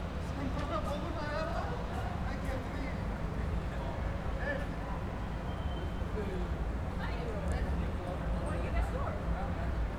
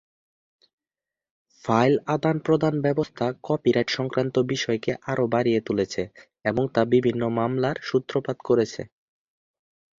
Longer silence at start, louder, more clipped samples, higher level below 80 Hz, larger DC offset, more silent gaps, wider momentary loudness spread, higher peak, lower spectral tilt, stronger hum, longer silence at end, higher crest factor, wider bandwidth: second, 0 s vs 1.65 s; second, -37 LUFS vs -24 LUFS; neither; first, -38 dBFS vs -60 dBFS; neither; neither; second, 3 LU vs 8 LU; second, -22 dBFS vs -6 dBFS; about the same, -7 dB/octave vs -6.5 dB/octave; neither; second, 0 s vs 1.1 s; second, 14 dB vs 20 dB; first, 12.5 kHz vs 7.6 kHz